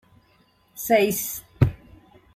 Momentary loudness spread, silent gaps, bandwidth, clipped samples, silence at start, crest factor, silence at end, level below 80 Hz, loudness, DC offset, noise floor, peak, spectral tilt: 13 LU; none; 16 kHz; under 0.1%; 0.75 s; 22 dB; 0.6 s; -46 dBFS; -23 LUFS; under 0.1%; -61 dBFS; -4 dBFS; -5.5 dB/octave